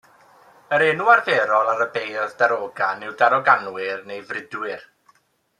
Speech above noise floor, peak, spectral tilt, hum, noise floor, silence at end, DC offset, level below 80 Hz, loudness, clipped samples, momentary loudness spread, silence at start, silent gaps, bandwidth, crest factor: 40 dB; -2 dBFS; -4.5 dB/octave; none; -60 dBFS; 0.8 s; under 0.1%; -76 dBFS; -20 LUFS; under 0.1%; 15 LU; 0.7 s; none; 12 kHz; 20 dB